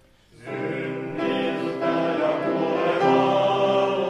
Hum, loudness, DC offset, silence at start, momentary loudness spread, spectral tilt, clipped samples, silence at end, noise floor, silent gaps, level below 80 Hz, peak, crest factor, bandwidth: none; -23 LUFS; under 0.1%; 0.4 s; 10 LU; -6.5 dB/octave; under 0.1%; 0 s; -44 dBFS; none; -66 dBFS; -8 dBFS; 14 dB; 10.5 kHz